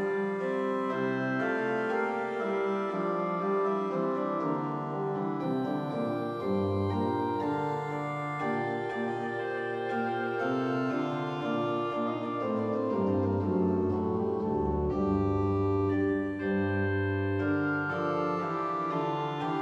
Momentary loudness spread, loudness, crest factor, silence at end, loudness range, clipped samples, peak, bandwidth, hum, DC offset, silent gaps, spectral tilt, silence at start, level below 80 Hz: 4 LU; -30 LUFS; 14 dB; 0 s; 3 LU; under 0.1%; -16 dBFS; 8.4 kHz; none; under 0.1%; none; -8.5 dB/octave; 0 s; -54 dBFS